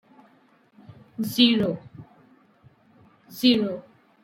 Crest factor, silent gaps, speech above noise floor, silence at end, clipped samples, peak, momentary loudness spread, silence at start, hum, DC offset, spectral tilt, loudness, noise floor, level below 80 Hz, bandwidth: 22 dB; none; 38 dB; 0.4 s; under 0.1%; -4 dBFS; 20 LU; 1.2 s; none; under 0.1%; -5 dB/octave; -22 LUFS; -59 dBFS; -66 dBFS; 16.5 kHz